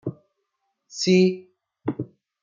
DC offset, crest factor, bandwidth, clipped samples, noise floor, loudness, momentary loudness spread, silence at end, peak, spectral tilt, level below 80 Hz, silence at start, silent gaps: under 0.1%; 18 dB; 7.6 kHz; under 0.1%; -77 dBFS; -22 LUFS; 20 LU; 0.4 s; -6 dBFS; -5.5 dB/octave; -70 dBFS; 0.05 s; none